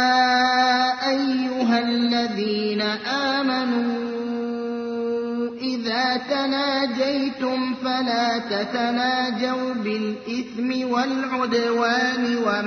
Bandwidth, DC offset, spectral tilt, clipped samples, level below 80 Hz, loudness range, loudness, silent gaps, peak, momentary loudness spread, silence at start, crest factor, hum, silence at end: 6.6 kHz; under 0.1%; -4 dB/octave; under 0.1%; -66 dBFS; 3 LU; -22 LUFS; none; -6 dBFS; 8 LU; 0 s; 16 dB; none; 0 s